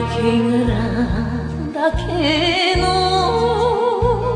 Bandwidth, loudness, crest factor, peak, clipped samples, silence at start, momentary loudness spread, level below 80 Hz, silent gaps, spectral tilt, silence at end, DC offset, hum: 10.5 kHz; -17 LUFS; 14 dB; -4 dBFS; under 0.1%; 0 s; 5 LU; -30 dBFS; none; -6 dB/octave; 0 s; under 0.1%; none